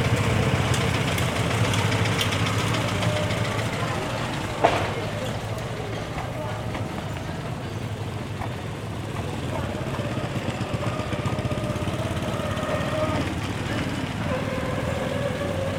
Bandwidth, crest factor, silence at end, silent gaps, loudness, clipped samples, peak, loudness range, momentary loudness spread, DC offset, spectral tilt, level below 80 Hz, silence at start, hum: 16.5 kHz; 22 dB; 0 s; none; -26 LUFS; under 0.1%; -2 dBFS; 7 LU; 9 LU; under 0.1%; -5.5 dB/octave; -42 dBFS; 0 s; none